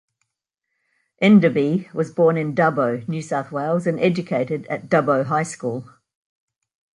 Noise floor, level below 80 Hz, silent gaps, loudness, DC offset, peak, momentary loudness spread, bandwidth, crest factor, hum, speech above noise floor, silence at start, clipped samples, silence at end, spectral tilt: -80 dBFS; -66 dBFS; none; -20 LUFS; under 0.1%; -4 dBFS; 11 LU; 11 kHz; 18 dB; none; 61 dB; 1.2 s; under 0.1%; 1.15 s; -7 dB/octave